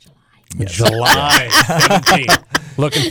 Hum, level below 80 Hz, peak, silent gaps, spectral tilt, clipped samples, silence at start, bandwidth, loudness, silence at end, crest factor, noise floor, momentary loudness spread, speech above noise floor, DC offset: none; -40 dBFS; -2 dBFS; none; -3 dB/octave; under 0.1%; 0.5 s; over 20 kHz; -12 LUFS; 0 s; 12 dB; -51 dBFS; 12 LU; 38 dB; under 0.1%